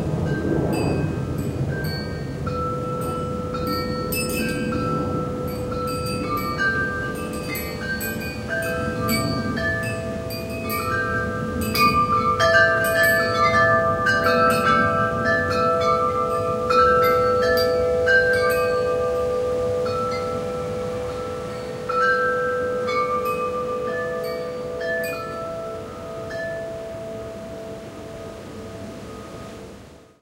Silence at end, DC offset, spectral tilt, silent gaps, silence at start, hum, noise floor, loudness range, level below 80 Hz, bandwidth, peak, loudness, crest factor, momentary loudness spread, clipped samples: 0.25 s; under 0.1%; -5 dB/octave; none; 0 s; none; -44 dBFS; 11 LU; -44 dBFS; 16.5 kHz; -4 dBFS; -22 LUFS; 18 dB; 16 LU; under 0.1%